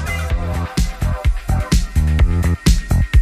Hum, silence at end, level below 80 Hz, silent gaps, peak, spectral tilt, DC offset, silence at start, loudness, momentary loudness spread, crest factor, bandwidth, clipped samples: none; 0 s; -18 dBFS; none; -2 dBFS; -5.5 dB/octave; under 0.1%; 0 s; -18 LUFS; 5 LU; 14 dB; 15.5 kHz; under 0.1%